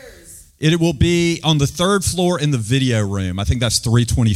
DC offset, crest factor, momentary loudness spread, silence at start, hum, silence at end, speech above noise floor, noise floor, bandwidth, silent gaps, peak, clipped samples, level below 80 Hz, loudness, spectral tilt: under 0.1%; 14 dB; 4 LU; 0.05 s; none; 0 s; 26 dB; -42 dBFS; 15.5 kHz; none; -2 dBFS; under 0.1%; -34 dBFS; -17 LUFS; -5 dB/octave